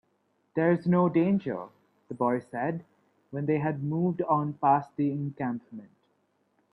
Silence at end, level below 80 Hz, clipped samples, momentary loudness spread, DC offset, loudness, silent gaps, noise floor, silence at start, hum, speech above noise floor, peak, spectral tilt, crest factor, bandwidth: 0.85 s; -70 dBFS; under 0.1%; 16 LU; under 0.1%; -28 LUFS; none; -72 dBFS; 0.55 s; none; 45 dB; -12 dBFS; -10.5 dB/octave; 18 dB; 5 kHz